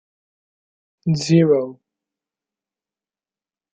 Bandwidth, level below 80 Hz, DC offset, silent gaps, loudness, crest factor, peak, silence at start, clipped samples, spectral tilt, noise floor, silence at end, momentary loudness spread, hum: 8.8 kHz; -62 dBFS; under 0.1%; none; -18 LUFS; 20 dB; -2 dBFS; 1.05 s; under 0.1%; -7 dB/octave; under -90 dBFS; 2 s; 14 LU; none